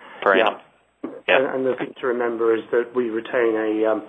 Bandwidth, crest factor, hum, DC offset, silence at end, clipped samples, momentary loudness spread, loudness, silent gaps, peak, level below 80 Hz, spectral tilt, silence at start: 4 kHz; 18 dB; none; under 0.1%; 0 s; under 0.1%; 9 LU; -21 LUFS; none; -2 dBFS; -72 dBFS; -6.5 dB/octave; 0 s